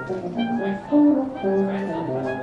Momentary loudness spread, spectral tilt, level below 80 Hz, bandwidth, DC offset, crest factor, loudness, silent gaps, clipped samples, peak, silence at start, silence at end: 9 LU; -8.5 dB/octave; -56 dBFS; 6.4 kHz; under 0.1%; 14 dB; -22 LUFS; none; under 0.1%; -8 dBFS; 0 s; 0 s